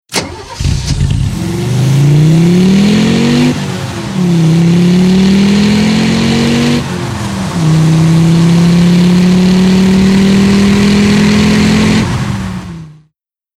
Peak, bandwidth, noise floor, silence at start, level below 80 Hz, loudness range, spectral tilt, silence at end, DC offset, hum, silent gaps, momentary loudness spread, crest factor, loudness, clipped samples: 0 dBFS; 14 kHz; -61 dBFS; 0.1 s; -28 dBFS; 2 LU; -6 dB/octave; 0.65 s; under 0.1%; none; none; 9 LU; 8 dB; -9 LUFS; under 0.1%